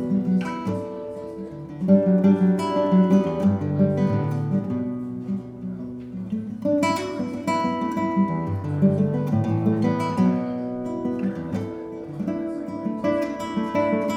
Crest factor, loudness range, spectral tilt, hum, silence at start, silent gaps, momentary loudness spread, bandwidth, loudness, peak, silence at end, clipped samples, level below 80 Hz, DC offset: 18 dB; 6 LU; -8 dB/octave; none; 0 s; none; 14 LU; 11 kHz; -23 LUFS; -4 dBFS; 0 s; under 0.1%; -56 dBFS; under 0.1%